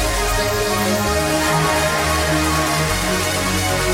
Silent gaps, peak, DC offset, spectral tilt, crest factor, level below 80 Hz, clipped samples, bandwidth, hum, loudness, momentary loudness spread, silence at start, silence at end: none; -4 dBFS; under 0.1%; -3.5 dB/octave; 14 dB; -28 dBFS; under 0.1%; 17 kHz; none; -17 LUFS; 2 LU; 0 s; 0 s